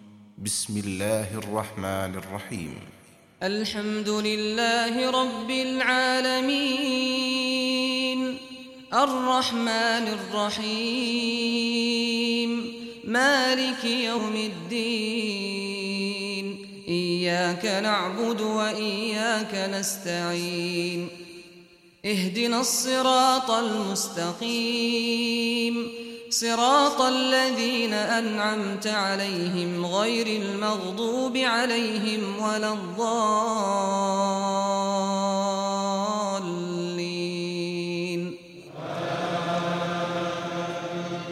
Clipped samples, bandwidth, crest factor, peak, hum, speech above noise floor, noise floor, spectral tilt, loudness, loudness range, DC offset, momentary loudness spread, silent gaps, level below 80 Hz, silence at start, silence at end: under 0.1%; 16 kHz; 18 dB; -8 dBFS; none; 27 dB; -53 dBFS; -3.5 dB/octave; -25 LUFS; 6 LU; under 0.1%; 9 LU; none; -68 dBFS; 0 s; 0 s